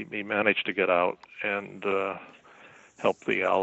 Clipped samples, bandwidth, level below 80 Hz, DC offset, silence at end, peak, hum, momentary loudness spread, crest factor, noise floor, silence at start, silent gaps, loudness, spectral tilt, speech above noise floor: under 0.1%; 8.2 kHz; -74 dBFS; under 0.1%; 0 s; -8 dBFS; none; 7 LU; 20 dB; -53 dBFS; 0 s; none; -27 LUFS; -5.5 dB/octave; 26 dB